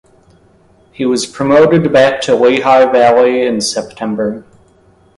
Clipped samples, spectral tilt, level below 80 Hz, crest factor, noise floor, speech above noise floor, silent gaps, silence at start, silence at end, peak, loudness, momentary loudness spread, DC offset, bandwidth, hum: under 0.1%; -5 dB/octave; -50 dBFS; 12 dB; -48 dBFS; 38 dB; none; 1 s; 0.75 s; 0 dBFS; -11 LUFS; 11 LU; under 0.1%; 11.5 kHz; none